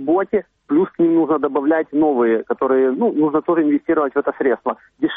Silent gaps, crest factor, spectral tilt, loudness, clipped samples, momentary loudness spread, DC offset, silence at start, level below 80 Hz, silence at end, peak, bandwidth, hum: none; 10 dB; -5.5 dB/octave; -18 LUFS; under 0.1%; 5 LU; under 0.1%; 0 s; -60 dBFS; 0 s; -6 dBFS; 3.8 kHz; none